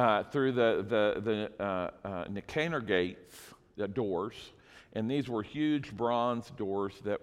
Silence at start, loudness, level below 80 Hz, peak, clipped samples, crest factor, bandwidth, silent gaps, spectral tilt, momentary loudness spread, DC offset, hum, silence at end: 0 s; -33 LUFS; -64 dBFS; -12 dBFS; under 0.1%; 20 dB; 15 kHz; none; -6.5 dB/octave; 13 LU; under 0.1%; none; 0.05 s